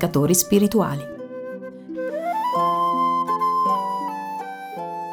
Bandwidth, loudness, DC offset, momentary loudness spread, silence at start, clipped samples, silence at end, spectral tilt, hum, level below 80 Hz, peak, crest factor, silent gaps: over 20 kHz; -22 LUFS; under 0.1%; 15 LU; 0 s; under 0.1%; 0 s; -5 dB/octave; none; -56 dBFS; -4 dBFS; 18 dB; none